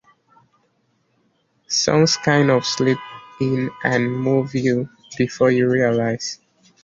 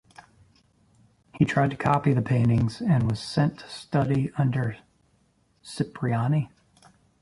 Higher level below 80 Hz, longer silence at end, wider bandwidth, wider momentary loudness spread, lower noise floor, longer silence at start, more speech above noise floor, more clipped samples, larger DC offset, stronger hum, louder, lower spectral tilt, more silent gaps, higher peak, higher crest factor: second, -58 dBFS vs -52 dBFS; second, 0.5 s vs 0.75 s; second, 7.6 kHz vs 11.5 kHz; about the same, 10 LU vs 10 LU; about the same, -65 dBFS vs -66 dBFS; first, 1.7 s vs 1.35 s; first, 47 dB vs 42 dB; neither; neither; neither; first, -19 LUFS vs -25 LUFS; second, -5 dB/octave vs -7.5 dB/octave; neither; first, -4 dBFS vs -8 dBFS; about the same, 18 dB vs 18 dB